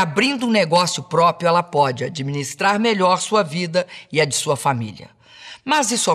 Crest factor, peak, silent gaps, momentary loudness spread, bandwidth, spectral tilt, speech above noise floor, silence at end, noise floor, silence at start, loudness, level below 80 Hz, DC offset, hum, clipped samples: 14 dB; -6 dBFS; none; 9 LU; 14 kHz; -3.5 dB/octave; 23 dB; 0 s; -42 dBFS; 0 s; -19 LUFS; -66 dBFS; under 0.1%; none; under 0.1%